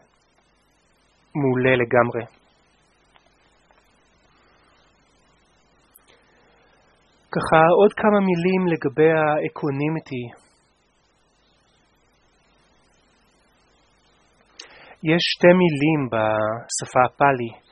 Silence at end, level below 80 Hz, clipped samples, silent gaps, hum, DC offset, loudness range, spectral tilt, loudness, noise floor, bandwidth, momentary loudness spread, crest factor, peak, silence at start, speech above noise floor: 0.15 s; -58 dBFS; under 0.1%; none; none; under 0.1%; 13 LU; -5.5 dB/octave; -20 LUFS; -63 dBFS; 10 kHz; 17 LU; 24 dB; 0 dBFS; 1.35 s; 44 dB